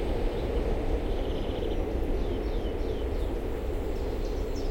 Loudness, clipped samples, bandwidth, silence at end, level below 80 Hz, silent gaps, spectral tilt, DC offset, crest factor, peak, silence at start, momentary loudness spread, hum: -32 LUFS; under 0.1%; 16.5 kHz; 0 s; -32 dBFS; none; -7.5 dB/octave; under 0.1%; 14 dB; -16 dBFS; 0 s; 3 LU; none